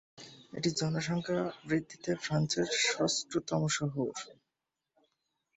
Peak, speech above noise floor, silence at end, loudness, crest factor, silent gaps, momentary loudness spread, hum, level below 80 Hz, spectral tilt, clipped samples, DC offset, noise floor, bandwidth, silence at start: -18 dBFS; 55 dB; 1.25 s; -32 LUFS; 18 dB; none; 14 LU; none; -68 dBFS; -4 dB/octave; under 0.1%; under 0.1%; -88 dBFS; 8.4 kHz; 0.15 s